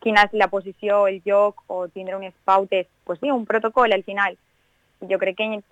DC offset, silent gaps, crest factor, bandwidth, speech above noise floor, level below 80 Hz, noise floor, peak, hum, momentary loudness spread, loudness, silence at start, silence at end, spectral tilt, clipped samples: under 0.1%; none; 18 dB; 9.4 kHz; 40 dB; -60 dBFS; -61 dBFS; -4 dBFS; none; 11 LU; -21 LUFS; 0.05 s; 0.1 s; -5 dB/octave; under 0.1%